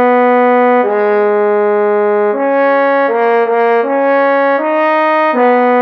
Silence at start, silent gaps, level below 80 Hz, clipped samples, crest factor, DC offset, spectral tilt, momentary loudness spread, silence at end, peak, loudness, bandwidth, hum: 0 s; none; -74 dBFS; under 0.1%; 8 dB; under 0.1%; -7.5 dB/octave; 3 LU; 0 s; -2 dBFS; -11 LUFS; 5.6 kHz; none